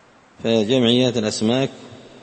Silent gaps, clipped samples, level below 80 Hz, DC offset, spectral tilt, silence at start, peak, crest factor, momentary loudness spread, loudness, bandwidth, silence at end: none; under 0.1%; -58 dBFS; under 0.1%; -5 dB/octave; 0.4 s; -2 dBFS; 18 dB; 8 LU; -19 LUFS; 8.8 kHz; 0.15 s